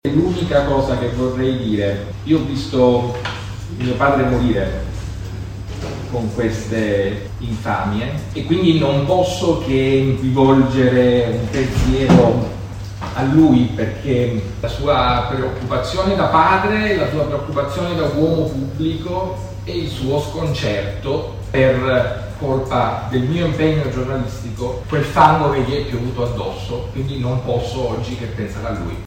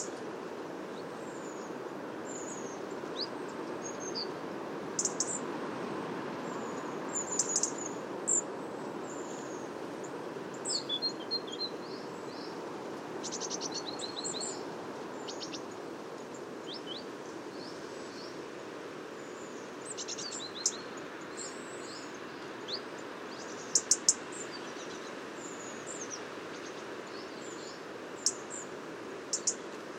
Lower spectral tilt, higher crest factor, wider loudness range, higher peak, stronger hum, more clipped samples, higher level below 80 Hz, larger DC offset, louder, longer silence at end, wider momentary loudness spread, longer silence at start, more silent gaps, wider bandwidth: first, -7 dB/octave vs -1.5 dB/octave; second, 18 dB vs 30 dB; second, 6 LU vs 9 LU; first, 0 dBFS vs -8 dBFS; neither; neither; first, -32 dBFS vs -82 dBFS; neither; first, -18 LUFS vs -37 LUFS; about the same, 0 s vs 0 s; about the same, 12 LU vs 12 LU; about the same, 0.05 s vs 0 s; neither; about the same, 16 kHz vs 16 kHz